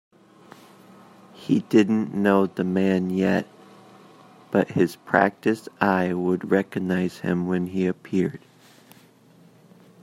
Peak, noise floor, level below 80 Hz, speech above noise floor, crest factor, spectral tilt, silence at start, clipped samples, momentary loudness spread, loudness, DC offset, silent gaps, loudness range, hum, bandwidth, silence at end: -2 dBFS; -54 dBFS; -68 dBFS; 31 dB; 22 dB; -7.5 dB/octave; 1.35 s; under 0.1%; 6 LU; -23 LUFS; under 0.1%; none; 3 LU; none; 13.5 kHz; 1.65 s